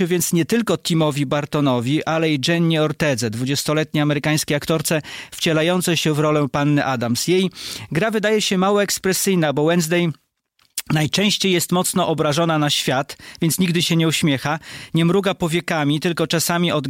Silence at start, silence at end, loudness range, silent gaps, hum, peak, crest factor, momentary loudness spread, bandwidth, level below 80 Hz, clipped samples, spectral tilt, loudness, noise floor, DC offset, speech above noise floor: 0 s; 0 s; 1 LU; none; none; -6 dBFS; 14 dB; 5 LU; 16.5 kHz; -54 dBFS; under 0.1%; -4.5 dB/octave; -19 LUFS; -63 dBFS; under 0.1%; 44 dB